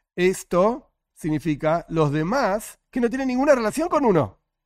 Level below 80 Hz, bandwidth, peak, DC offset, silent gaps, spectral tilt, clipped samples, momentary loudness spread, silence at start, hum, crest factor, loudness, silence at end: -50 dBFS; 16 kHz; -6 dBFS; under 0.1%; none; -6.5 dB/octave; under 0.1%; 10 LU; 0.15 s; none; 18 dB; -22 LUFS; 0.35 s